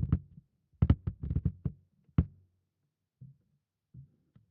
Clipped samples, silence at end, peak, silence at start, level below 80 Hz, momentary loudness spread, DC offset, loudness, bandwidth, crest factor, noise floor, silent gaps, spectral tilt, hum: under 0.1%; 0.5 s; -10 dBFS; 0 s; -44 dBFS; 11 LU; under 0.1%; -34 LUFS; 4.1 kHz; 26 dB; -84 dBFS; none; -10.5 dB/octave; none